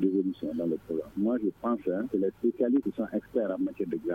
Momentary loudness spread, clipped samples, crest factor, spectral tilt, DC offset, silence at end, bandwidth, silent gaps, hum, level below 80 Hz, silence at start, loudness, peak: 5 LU; under 0.1%; 14 dB; -9.5 dB/octave; under 0.1%; 0 s; 4.6 kHz; none; none; -64 dBFS; 0 s; -30 LUFS; -14 dBFS